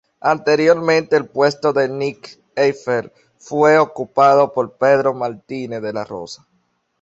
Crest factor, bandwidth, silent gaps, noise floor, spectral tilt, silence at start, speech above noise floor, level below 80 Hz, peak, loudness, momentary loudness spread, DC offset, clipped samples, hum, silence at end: 16 dB; 8 kHz; none; -65 dBFS; -5.5 dB/octave; 0.25 s; 49 dB; -62 dBFS; -2 dBFS; -17 LUFS; 15 LU; under 0.1%; under 0.1%; none; 0.65 s